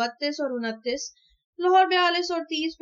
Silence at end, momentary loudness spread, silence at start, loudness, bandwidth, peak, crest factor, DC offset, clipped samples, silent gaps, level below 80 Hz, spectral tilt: 0.1 s; 11 LU; 0 s; -24 LUFS; 7.6 kHz; -8 dBFS; 16 dB; under 0.1%; under 0.1%; 1.44-1.53 s; -70 dBFS; -2 dB/octave